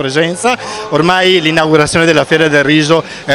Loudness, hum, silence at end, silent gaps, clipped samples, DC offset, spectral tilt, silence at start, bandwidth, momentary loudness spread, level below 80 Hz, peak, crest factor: -10 LUFS; none; 0 s; none; 0.8%; under 0.1%; -4.5 dB/octave; 0 s; 14 kHz; 6 LU; -44 dBFS; 0 dBFS; 10 dB